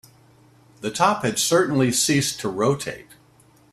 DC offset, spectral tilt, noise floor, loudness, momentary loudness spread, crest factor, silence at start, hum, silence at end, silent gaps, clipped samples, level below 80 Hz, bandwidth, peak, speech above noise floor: under 0.1%; -3.5 dB/octave; -55 dBFS; -21 LUFS; 13 LU; 18 dB; 0.8 s; none; 0.7 s; none; under 0.1%; -60 dBFS; 15.5 kHz; -4 dBFS; 34 dB